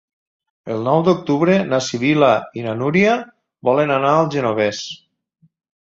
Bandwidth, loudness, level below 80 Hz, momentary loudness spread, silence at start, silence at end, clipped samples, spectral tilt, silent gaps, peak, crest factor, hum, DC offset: 7.8 kHz; -17 LUFS; -58 dBFS; 12 LU; 0.65 s; 0.9 s; under 0.1%; -6 dB/octave; none; -2 dBFS; 16 dB; none; under 0.1%